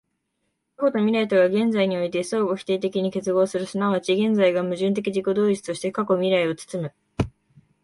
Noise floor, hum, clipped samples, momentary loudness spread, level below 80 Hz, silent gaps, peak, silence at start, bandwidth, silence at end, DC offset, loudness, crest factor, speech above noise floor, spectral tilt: -75 dBFS; none; under 0.1%; 10 LU; -52 dBFS; none; -8 dBFS; 0.8 s; 11.5 kHz; 0.55 s; under 0.1%; -23 LUFS; 16 dB; 53 dB; -6 dB/octave